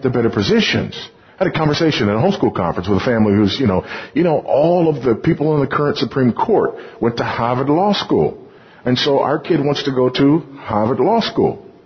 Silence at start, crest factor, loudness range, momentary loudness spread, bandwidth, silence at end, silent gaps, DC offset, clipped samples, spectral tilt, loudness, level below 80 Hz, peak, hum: 0 s; 14 dB; 1 LU; 6 LU; 6.6 kHz; 0.2 s; none; under 0.1%; under 0.1%; -7 dB/octave; -16 LUFS; -42 dBFS; -2 dBFS; none